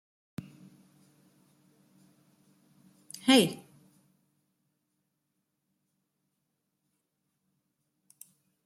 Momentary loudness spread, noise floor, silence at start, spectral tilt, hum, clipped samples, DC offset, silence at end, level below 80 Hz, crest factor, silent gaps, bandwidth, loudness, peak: 24 LU; -82 dBFS; 3.25 s; -3.5 dB/octave; none; under 0.1%; under 0.1%; 5.1 s; -80 dBFS; 30 dB; none; 15 kHz; -25 LUFS; -8 dBFS